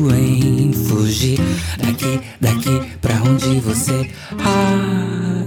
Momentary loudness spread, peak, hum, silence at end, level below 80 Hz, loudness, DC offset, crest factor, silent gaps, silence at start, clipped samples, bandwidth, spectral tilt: 5 LU; -4 dBFS; none; 0 s; -36 dBFS; -17 LUFS; under 0.1%; 12 dB; none; 0 s; under 0.1%; 18 kHz; -5.5 dB/octave